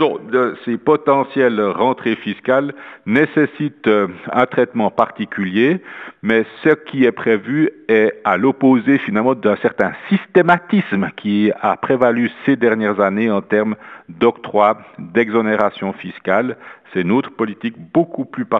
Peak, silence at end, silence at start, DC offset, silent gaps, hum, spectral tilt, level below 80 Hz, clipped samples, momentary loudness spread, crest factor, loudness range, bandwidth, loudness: 0 dBFS; 0 s; 0 s; under 0.1%; none; none; -8.5 dB/octave; -62 dBFS; under 0.1%; 8 LU; 16 dB; 3 LU; 6.4 kHz; -17 LUFS